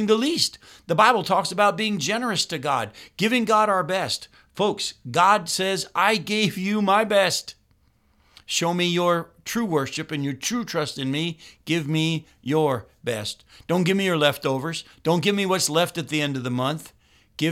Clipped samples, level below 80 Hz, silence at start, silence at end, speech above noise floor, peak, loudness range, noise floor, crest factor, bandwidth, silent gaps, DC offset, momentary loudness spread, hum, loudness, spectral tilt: under 0.1%; -62 dBFS; 0 s; 0 s; 39 dB; -2 dBFS; 4 LU; -62 dBFS; 22 dB; 16.5 kHz; none; under 0.1%; 10 LU; none; -23 LUFS; -4 dB/octave